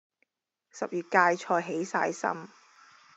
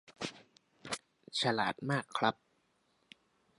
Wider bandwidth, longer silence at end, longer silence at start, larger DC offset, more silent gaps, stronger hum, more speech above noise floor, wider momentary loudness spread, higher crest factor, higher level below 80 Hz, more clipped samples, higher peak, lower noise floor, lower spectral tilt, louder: second, 8.2 kHz vs 11.5 kHz; second, 0.7 s vs 1.25 s; first, 0.75 s vs 0.1 s; neither; neither; neither; first, 50 dB vs 41 dB; about the same, 12 LU vs 12 LU; about the same, 24 dB vs 26 dB; second, under -90 dBFS vs -76 dBFS; neither; first, -8 dBFS vs -14 dBFS; first, -79 dBFS vs -75 dBFS; about the same, -4.5 dB/octave vs -4 dB/octave; first, -28 LUFS vs -36 LUFS